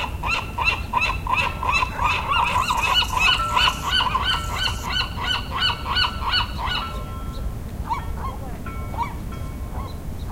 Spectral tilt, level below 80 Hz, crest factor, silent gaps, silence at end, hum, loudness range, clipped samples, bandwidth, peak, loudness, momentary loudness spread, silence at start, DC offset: -3 dB/octave; -32 dBFS; 18 dB; none; 0 s; none; 10 LU; under 0.1%; 16 kHz; -6 dBFS; -22 LUFS; 14 LU; 0 s; under 0.1%